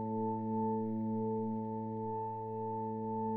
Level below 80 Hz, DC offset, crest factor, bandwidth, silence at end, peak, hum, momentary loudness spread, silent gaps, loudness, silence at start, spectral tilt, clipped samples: -72 dBFS; under 0.1%; 10 dB; 2.8 kHz; 0 s; -26 dBFS; none; 4 LU; none; -38 LUFS; 0 s; -13 dB/octave; under 0.1%